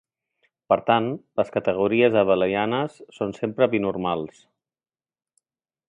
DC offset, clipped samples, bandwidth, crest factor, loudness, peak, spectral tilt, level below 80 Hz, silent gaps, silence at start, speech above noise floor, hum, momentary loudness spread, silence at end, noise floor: under 0.1%; under 0.1%; 9.8 kHz; 20 dB; -23 LUFS; -4 dBFS; -7.5 dB/octave; -60 dBFS; none; 0.7 s; over 68 dB; none; 12 LU; 1.6 s; under -90 dBFS